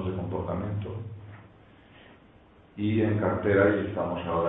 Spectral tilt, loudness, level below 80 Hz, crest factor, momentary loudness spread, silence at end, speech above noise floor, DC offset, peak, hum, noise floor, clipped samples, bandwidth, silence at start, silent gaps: -11.5 dB/octave; -27 LUFS; -54 dBFS; 20 dB; 20 LU; 0 s; 31 dB; under 0.1%; -10 dBFS; none; -56 dBFS; under 0.1%; 4 kHz; 0 s; none